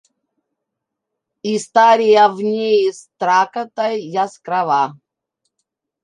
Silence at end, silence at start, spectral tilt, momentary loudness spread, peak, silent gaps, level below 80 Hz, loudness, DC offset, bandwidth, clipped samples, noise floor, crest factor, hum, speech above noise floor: 1.1 s; 1.45 s; -4 dB/octave; 11 LU; -2 dBFS; none; -76 dBFS; -16 LUFS; under 0.1%; 10.5 kHz; under 0.1%; -80 dBFS; 16 dB; none; 64 dB